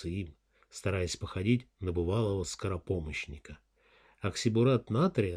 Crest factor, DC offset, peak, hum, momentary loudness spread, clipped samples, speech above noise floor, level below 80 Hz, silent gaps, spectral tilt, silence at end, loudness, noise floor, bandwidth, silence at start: 18 dB; under 0.1%; -14 dBFS; none; 14 LU; under 0.1%; 33 dB; -52 dBFS; none; -6 dB/octave; 0 s; -32 LUFS; -65 dBFS; 13.5 kHz; 0 s